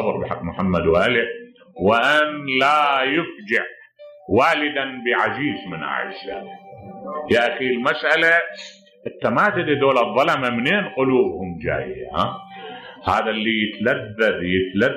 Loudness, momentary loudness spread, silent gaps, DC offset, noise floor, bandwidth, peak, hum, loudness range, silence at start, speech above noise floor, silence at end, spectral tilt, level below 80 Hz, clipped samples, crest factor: -19 LUFS; 16 LU; none; under 0.1%; -44 dBFS; 13.5 kHz; -4 dBFS; none; 4 LU; 0 s; 24 dB; 0 s; -5.5 dB/octave; -50 dBFS; under 0.1%; 16 dB